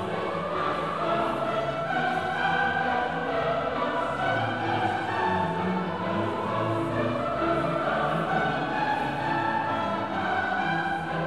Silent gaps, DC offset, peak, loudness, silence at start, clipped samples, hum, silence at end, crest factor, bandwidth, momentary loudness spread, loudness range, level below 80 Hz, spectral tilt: none; 0.3%; -14 dBFS; -27 LUFS; 0 s; under 0.1%; none; 0 s; 14 dB; 13 kHz; 3 LU; 1 LU; -54 dBFS; -6.5 dB/octave